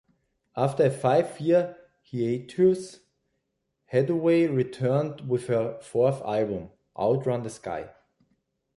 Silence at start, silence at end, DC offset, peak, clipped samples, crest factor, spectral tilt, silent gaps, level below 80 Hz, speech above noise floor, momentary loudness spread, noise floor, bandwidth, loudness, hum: 0.55 s; 0.85 s; under 0.1%; -8 dBFS; under 0.1%; 18 dB; -7.5 dB/octave; none; -64 dBFS; 53 dB; 13 LU; -78 dBFS; 11.5 kHz; -26 LUFS; none